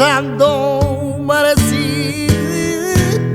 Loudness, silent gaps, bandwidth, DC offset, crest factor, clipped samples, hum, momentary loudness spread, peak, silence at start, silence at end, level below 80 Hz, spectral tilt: -15 LUFS; none; 18 kHz; under 0.1%; 14 dB; under 0.1%; none; 5 LU; 0 dBFS; 0 s; 0 s; -32 dBFS; -5 dB/octave